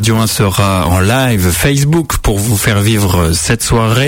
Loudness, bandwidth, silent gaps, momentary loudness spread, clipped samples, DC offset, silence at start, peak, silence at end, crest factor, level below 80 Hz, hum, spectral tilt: -11 LUFS; 16.5 kHz; none; 2 LU; under 0.1%; under 0.1%; 0 s; 0 dBFS; 0 s; 10 dB; -24 dBFS; none; -4.5 dB/octave